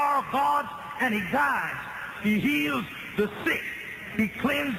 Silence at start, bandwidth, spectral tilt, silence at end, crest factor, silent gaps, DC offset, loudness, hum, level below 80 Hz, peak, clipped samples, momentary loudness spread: 0 s; 14.5 kHz; -5 dB/octave; 0 s; 14 dB; none; under 0.1%; -27 LUFS; none; -58 dBFS; -12 dBFS; under 0.1%; 9 LU